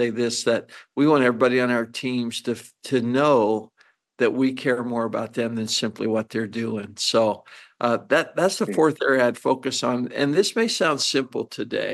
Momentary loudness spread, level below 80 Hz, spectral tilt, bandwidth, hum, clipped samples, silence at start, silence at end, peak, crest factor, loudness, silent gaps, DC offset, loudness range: 9 LU; -72 dBFS; -4 dB/octave; 12.5 kHz; none; under 0.1%; 0 s; 0 s; -6 dBFS; 18 dB; -22 LUFS; none; under 0.1%; 3 LU